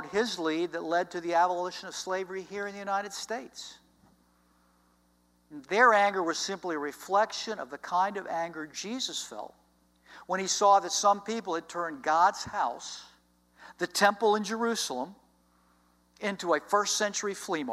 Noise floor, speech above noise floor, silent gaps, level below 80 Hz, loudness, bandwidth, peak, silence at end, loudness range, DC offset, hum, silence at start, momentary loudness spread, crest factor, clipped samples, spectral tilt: -67 dBFS; 38 dB; none; -72 dBFS; -29 LUFS; 15.5 kHz; -8 dBFS; 0 s; 7 LU; under 0.1%; 60 Hz at -70 dBFS; 0 s; 14 LU; 22 dB; under 0.1%; -2 dB/octave